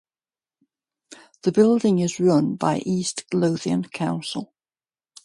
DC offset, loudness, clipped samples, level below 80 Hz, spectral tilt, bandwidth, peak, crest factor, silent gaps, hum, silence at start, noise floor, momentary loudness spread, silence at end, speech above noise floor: under 0.1%; -22 LUFS; under 0.1%; -66 dBFS; -6 dB/octave; 11.5 kHz; -6 dBFS; 18 dB; none; none; 1.1 s; under -90 dBFS; 9 LU; 0.8 s; over 69 dB